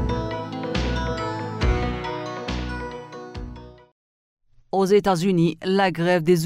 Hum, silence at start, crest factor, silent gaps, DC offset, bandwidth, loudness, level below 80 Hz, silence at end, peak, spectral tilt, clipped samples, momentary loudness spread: none; 0 s; 18 dB; 3.92-4.37 s; under 0.1%; 16 kHz; -23 LUFS; -34 dBFS; 0 s; -6 dBFS; -6.5 dB/octave; under 0.1%; 18 LU